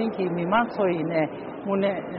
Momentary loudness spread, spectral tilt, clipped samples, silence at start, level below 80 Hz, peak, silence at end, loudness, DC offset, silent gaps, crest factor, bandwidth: 6 LU; -5.5 dB/octave; under 0.1%; 0 s; -62 dBFS; -10 dBFS; 0 s; -25 LUFS; under 0.1%; none; 14 dB; 5.4 kHz